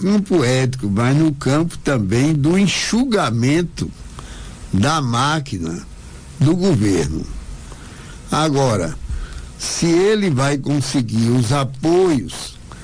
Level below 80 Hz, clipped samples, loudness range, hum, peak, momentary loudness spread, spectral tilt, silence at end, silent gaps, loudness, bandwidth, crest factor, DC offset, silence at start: -36 dBFS; under 0.1%; 4 LU; none; -6 dBFS; 19 LU; -5.5 dB/octave; 0 s; none; -17 LUFS; 10.5 kHz; 12 dB; under 0.1%; 0 s